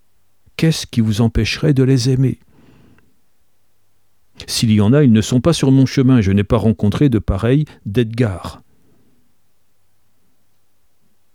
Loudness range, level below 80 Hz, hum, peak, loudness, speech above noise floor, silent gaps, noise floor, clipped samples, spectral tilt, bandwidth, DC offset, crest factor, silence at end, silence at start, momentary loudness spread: 8 LU; -36 dBFS; none; -2 dBFS; -15 LUFS; 52 dB; none; -66 dBFS; under 0.1%; -6.5 dB/octave; 15.5 kHz; 0.3%; 16 dB; 2.8 s; 0.6 s; 8 LU